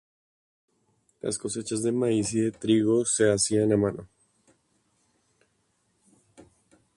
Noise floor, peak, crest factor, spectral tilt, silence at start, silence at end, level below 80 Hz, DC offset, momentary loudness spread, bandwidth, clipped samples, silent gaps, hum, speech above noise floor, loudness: -72 dBFS; -10 dBFS; 20 dB; -4.5 dB/octave; 1.25 s; 2.9 s; -60 dBFS; under 0.1%; 9 LU; 11.5 kHz; under 0.1%; none; none; 47 dB; -25 LUFS